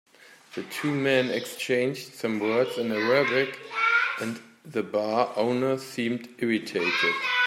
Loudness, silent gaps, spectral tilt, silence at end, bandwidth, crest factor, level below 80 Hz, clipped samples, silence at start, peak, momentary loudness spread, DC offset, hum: -26 LUFS; none; -4.5 dB/octave; 0 s; 16 kHz; 18 dB; -76 dBFS; under 0.1%; 0.3 s; -8 dBFS; 10 LU; under 0.1%; none